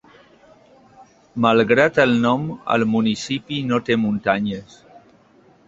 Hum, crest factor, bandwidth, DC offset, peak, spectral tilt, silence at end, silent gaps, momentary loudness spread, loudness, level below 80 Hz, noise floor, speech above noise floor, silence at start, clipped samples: none; 20 dB; 7.8 kHz; under 0.1%; -2 dBFS; -6 dB/octave; 1.05 s; none; 10 LU; -19 LUFS; -56 dBFS; -53 dBFS; 34 dB; 1 s; under 0.1%